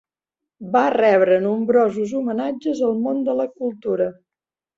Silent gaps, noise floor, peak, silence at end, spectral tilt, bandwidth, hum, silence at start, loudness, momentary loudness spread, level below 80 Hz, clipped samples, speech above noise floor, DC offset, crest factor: none; -89 dBFS; -4 dBFS; 0.65 s; -7 dB/octave; 7.8 kHz; none; 0.6 s; -20 LUFS; 9 LU; -66 dBFS; under 0.1%; 70 dB; under 0.1%; 16 dB